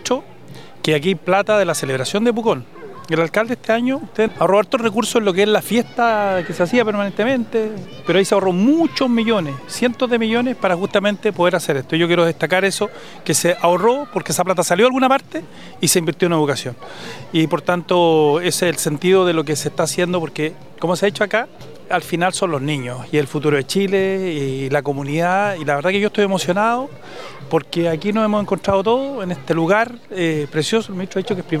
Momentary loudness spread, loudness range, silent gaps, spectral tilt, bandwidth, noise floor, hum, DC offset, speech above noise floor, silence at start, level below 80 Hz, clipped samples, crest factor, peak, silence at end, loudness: 9 LU; 3 LU; none; -4.5 dB/octave; 16 kHz; -39 dBFS; none; 0.8%; 22 dB; 0 s; -58 dBFS; under 0.1%; 18 dB; 0 dBFS; 0 s; -18 LUFS